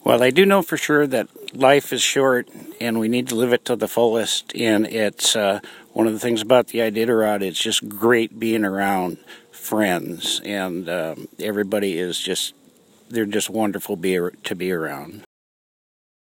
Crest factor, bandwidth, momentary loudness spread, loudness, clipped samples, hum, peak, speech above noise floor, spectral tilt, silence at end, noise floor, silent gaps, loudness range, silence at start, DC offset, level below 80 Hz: 20 dB; 17 kHz; 11 LU; -20 LUFS; under 0.1%; none; 0 dBFS; 33 dB; -3.5 dB/octave; 1.1 s; -53 dBFS; none; 5 LU; 0.05 s; under 0.1%; -66 dBFS